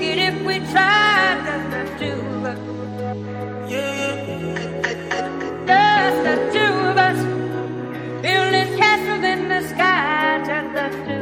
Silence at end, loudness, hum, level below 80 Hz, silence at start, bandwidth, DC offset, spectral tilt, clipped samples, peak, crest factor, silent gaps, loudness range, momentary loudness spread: 0 s; -19 LUFS; none; -56 dBFS; 0 s; 16.5 kHz; under 0.1%; -4.5 dB/octave; under 0.1%; -2 dBFS; 18 dB; none; 7 LU; 13 LU